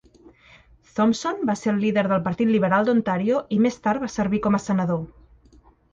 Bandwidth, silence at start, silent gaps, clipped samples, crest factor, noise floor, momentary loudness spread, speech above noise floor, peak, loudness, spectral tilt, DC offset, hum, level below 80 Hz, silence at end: 7.8 kHz; 0.95 s; none; under 0.1%; 16 dB; -54 dBFS; 5 LU; 33 dB; -8 dBFS; -22 LUFS; -6.5 dB/octave; under 0.1%; none; -54 dBFS; 0.85 s